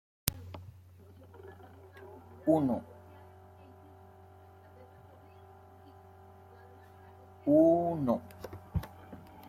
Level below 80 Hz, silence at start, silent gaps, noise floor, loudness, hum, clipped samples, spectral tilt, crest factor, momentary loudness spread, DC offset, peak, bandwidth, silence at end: -58 dBFS; 0.25 s; none; -56 dBFS; -30 LUFS; none; under 0.1%; -6.5 dB/octave; 32 dB; 29 LU; under 0.1%; -2 dBFS; 16 kHz; 0.3 s